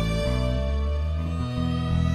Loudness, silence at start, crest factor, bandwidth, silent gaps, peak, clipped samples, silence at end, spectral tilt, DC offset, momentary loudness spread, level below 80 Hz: -27 LUFS; 0 s; 12 dB; 11.5 kHz; none; -12 dBFS; under 0.1%; 0 s; -7 dB/octave; 0.2%; 3 LU; -28 dBFS